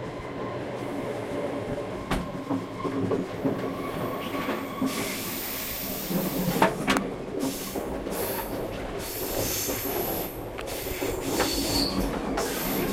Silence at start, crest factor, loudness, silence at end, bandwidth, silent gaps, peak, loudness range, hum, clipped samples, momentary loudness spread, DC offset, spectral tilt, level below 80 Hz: 0 s; 24 dB; -29 LUFS; 0 s; 16.5 kHz; none; -4 dBFS; 3 LU; none; under 0.1%; 8 LU; under 0.1%; -4 dB/octave; -44 dBFS